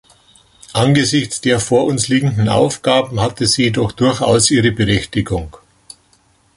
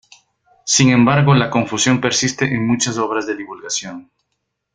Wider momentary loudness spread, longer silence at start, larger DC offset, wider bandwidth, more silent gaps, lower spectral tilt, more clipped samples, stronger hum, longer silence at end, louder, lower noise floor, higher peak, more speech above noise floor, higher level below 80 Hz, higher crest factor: second, 7 LU vs 14 LU; about the same, 0.7 s vs 0.65 s; neither; first, 11.5 kHz vs 9.6 kHz; neither; about the same, -4.5 dB/octave vs -4 dB/octave; neither; neither; first, 1.05 s vs 0.75 s; about the same, -15 LUFS vs -16 LUFS; second, -55 dBFS vs -74 dBFS; about the same, 0 dBFS vs 0 dBFS; second, 40 dB vs 58 dB; first, -38 dBFS vs -52 dBFS; about the same, 16 dB vs 16 dB